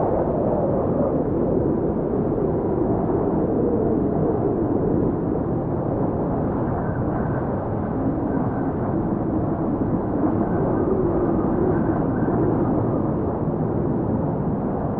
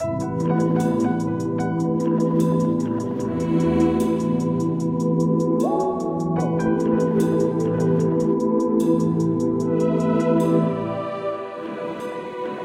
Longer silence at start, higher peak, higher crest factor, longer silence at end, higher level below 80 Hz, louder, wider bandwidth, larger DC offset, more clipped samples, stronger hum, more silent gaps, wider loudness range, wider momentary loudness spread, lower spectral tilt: about the same, 0 s vs 0 s; about the same, -8 dBFS vs -6 dBFS; about the same, 12 dB vs 14 dB; about the same, 0 s vs 0 s; first, -38 dBFS vs -52 dBFS; about the same, -22 LUFS vs -21 LUFS; second, 3.3 kHz vs 13.5 kHz; neither; neither; neither; neither; about the same, 2 LU vs 1 LU; second, 3 LU vs 8 LU; first, -11.5 dB/octave vs -8.5 dB/octave